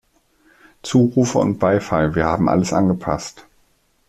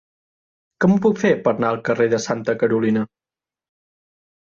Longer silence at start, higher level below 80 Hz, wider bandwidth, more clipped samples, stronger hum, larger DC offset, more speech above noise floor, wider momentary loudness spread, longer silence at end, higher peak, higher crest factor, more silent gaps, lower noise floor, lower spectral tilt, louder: about the same, 0.85 s vs 0.8 s; first, -44 dBFS vs -58 dBFS; first, 13.5 kHz vs 7.4 kHz; neither; neither; neither; second, 43 dB vs over 72 dB; first, 9 LU vs 5 LU; second, 0.7 s vs 1.5 s; about the same, -2 dBFS vs -4 dBFS; about the same, 16 dB vs 16 dB; neither; second, -60 dBFS vs under -90 dBFS; about the same, -6.5 dB/octave vs -6.5 dB/octave; about the same, -18 LUFS vs -19 LUFS